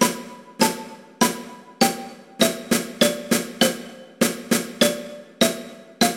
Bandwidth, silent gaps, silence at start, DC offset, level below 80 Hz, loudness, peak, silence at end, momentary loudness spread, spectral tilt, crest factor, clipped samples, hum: 16.5 kHz; none; 0 s; under 0.1%; -60 dBFS; -22 LUFS; -2 dBFS; 0 s; 19 LU; -3 dB/octave; 22 dB; under 0.1%; none